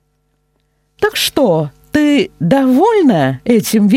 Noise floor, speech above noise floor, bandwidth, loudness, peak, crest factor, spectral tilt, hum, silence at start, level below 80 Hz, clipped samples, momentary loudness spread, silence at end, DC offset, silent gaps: -62 dBFS; 51 dB; 16.5 kHz; -13 LUFS; 0 dBFS; 12 dB; -5.5 dB/octave; none; 1 s; -48 dBFS; under 0.1%; 7 LU; 0 s; under 0.1%; none